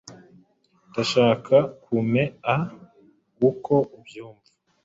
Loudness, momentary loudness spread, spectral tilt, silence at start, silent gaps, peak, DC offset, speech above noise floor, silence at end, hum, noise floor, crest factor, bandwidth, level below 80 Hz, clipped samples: -23 LUFS; 14 LU; -6.5 dB/octave; 0.1 s; none; -4 dBFS; under 0.1%; 39 dB; 0.55 s; none; -61 dBFS; 20 dB; 7.8 kHz; -62 dBFS; under 0.1%